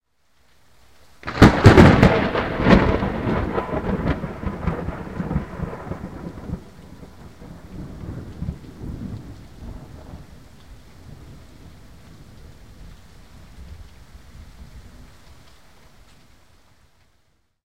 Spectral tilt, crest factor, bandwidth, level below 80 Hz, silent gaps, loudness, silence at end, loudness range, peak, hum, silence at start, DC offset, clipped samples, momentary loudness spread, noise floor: -7.5 dB/octave; 22 dB; 15.5 kHz; -34 dBFS; none; -19 LUFS; 2.85 s; 23 LU; 0 dBFS; none; 1.25 s; 0.3%; under 0.1%; 30 LU; -65 dBFS